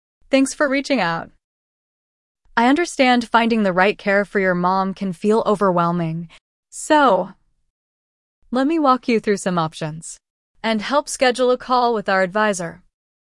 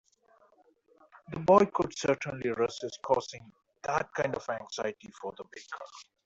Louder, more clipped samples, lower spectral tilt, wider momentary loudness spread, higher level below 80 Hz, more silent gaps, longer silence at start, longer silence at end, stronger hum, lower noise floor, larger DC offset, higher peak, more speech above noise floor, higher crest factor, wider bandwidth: first, -18 LUFS vs -30 LUFS; neither; about the same, -5 dB/octave vs -5 dB/octave; second, 11 LU vs 20 LU; first, -54 dBFS vs -66 dBFS; first, 1.44-2.35 s, 6.41-6.63 s, 7.70-8.42 s, 10.30-10.54 s vs none; second, 0.3 s vs 1.3 s; first, 0.45 s vs 0.25 s; neither; first, under -90 dBFS vs -65 dBFS; neither; first, -2 dBFS vs -8 dBFS; first, over 72 dB vs 35 dB; second, 18 dB vs 24 dB; first, 12 kHz vs 8 kHz